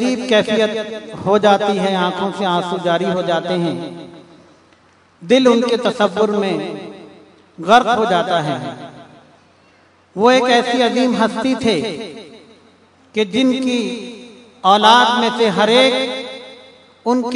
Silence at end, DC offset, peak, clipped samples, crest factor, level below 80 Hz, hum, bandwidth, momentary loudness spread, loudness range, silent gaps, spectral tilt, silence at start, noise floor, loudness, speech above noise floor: 0 s; under 0.1%; 0 dBFS; under 0.1%; 16 dB; -62 dBFS; none; 12 kHz; 18 LU; 5 LU; none; -4.5 dB/octave; 0 s; -51 dBFS; -15 LUFS; 36 dB